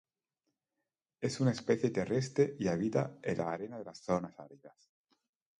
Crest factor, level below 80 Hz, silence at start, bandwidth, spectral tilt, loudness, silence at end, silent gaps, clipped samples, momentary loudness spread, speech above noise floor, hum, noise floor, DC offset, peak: 20 dB; -68 dBFS; 1.2 s; 11 kHz; -6.5 dB/octave; -34 LUFS; 0.9 s; none; under 0.1%; 13 LU; 55 dB; none; -89 dBFS; under 0.1%; -16 dBFS